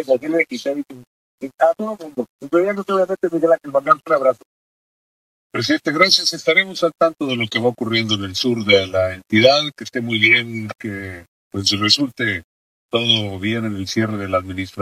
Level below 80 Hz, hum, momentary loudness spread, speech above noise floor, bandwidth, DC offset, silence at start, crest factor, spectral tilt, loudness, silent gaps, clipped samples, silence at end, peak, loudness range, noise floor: -60 dBFS; none; 15 LU; over 72 dB; 15.5 kHz; under 0.1%; 0 s; 20 dB; -4 dB/octave; -18 LUFS; 1.07-1.38 s, 2.29-2.39 s, 4.46-5.50 s, 11.28-11.51 s, 12.44-12.89 s; under 0.1%; 0 s; 0 dBFS; 3 LU; under -90 dBFS